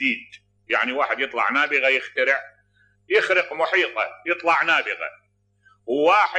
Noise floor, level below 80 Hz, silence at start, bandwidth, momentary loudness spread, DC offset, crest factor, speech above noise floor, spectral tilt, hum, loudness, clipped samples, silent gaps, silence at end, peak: -62 dBFS; -74 dBFS; 0 s; 9 kHz; 10 LU; under 0.1%; 16 dB; 40 dB; -3 dB/octave; 50 Hz at -70 dBFS; -21 LUFS; under 0.1%; none; 0 s; -6 dBFS